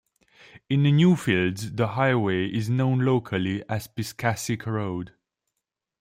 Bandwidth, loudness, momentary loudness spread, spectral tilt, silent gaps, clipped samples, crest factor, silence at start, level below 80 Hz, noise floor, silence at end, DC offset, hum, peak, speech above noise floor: 16 kHz; -24 LUFS; 11 LU; -6.5 dB/octave; none; under 0.1%; 16 dB; 0.7 s; -60 dBFS; -84 dBFS; 0.95 s; under 0.1%; none; -8 dBFS; 61 dB